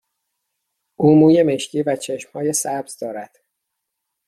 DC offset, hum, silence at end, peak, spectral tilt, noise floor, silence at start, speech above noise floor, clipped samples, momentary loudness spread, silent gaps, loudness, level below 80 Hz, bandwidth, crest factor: under 0.1%; none; 1.05 s; -2 dBFS; -5.5 dB/octave; -78 dBFS; 1 s; 61 dB; under 0.1%; 17 LU; none; -17 LUFS; -64 dBFS; 14 kHz; 18 dB